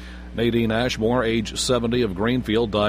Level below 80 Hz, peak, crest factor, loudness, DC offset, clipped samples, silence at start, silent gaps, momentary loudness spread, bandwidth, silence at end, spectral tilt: -38 dBFS; -6 dBFS; 16 dB; -22 LUFS; under 0.1%; under 0.1%; 0 s; none; 3 LU; 15.5 kHz; 0 s; -5 dB/octave